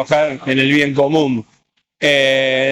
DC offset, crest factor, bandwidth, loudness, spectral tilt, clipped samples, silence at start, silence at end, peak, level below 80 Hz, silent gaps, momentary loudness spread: under 0.1%; 12 dB; 14 kHz; -15 LUFS; -5 dB/octave; under 0.1%; 0 s; 0 s; -4 dBFS; -58 dBFS; none; 6 LU